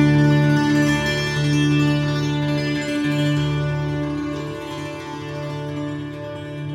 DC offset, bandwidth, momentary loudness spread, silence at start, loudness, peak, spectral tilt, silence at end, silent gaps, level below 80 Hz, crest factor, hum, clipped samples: under 0.1%; 13.5 kHz; 13 LU; 0 s; -21 LUFS; -6 dBFS; -6.5 dB/octave; 0 s; none; -44 dBFS; 14 dB; none; under 0.1%